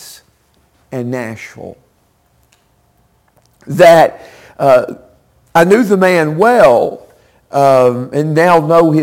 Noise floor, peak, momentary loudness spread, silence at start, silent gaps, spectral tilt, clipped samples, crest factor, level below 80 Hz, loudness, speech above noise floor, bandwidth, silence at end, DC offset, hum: -55 dBFS; 0 dBFS; 18 LU; 0.05 s; none; -6.5 dB/octave; under 0.1%; 12 dB; -50 dBFS; -10 LUFS; 46 dB; 17 kHz; 0 s; under 0.1%; none